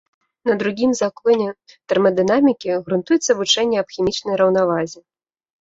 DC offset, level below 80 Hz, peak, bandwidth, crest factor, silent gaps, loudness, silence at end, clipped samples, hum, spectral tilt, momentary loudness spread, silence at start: under 0.1%; -58 dBFS; -2 dBFS; 8 kHz; 16 dB; none; -18 LUFS; 0.65 s; under 0.1%; none; -4 dB/octave; 6 LU; 0.45 s